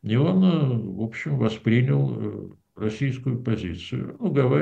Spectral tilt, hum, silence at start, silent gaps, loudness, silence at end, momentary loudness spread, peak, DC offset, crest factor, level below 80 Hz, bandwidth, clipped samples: -8.5 dB/octave; none; 0.05 s; none; -24 LUFS; 0 s; 11 LU; -8 dBFS; under 0.1%; 16 dB; -56 dBFS; 7.8 kHz; under 0.1%